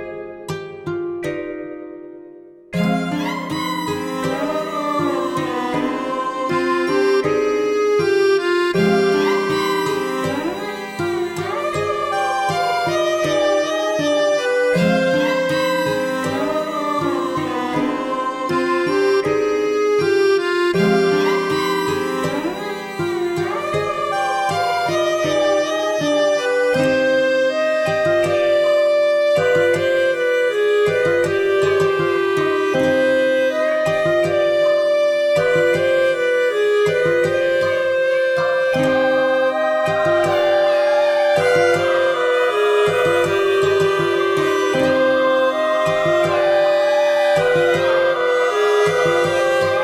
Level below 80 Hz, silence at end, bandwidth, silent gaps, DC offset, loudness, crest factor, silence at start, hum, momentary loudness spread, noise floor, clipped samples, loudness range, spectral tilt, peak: -56 dBFS; 0 s; 17 kHz; none; under 0.1%; -17 LUFS; 14 dB; 0 s; none; 7 LU; -41 dBFS; under 0.1%; 5 LU; -5 dB/octave; -4 dBFS